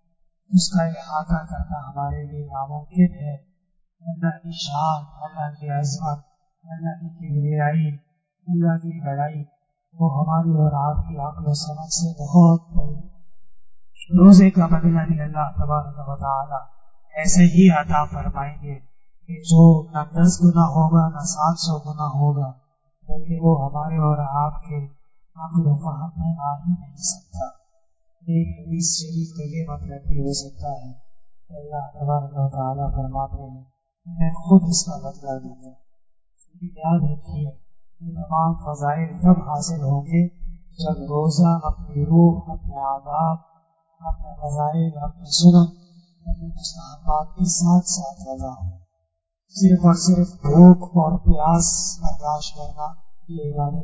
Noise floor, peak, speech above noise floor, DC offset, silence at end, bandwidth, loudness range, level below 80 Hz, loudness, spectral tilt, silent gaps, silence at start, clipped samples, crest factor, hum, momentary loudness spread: -75 dBFS; 0 dBFS; 56 dB; under 0.1%; 0 s; 8 kHz; 10 LU; -36 dBFS; -20 LUFS; -6.5 dB/octave; none; 0.5 s; under 0.1%; 18 dB; none; 18 LU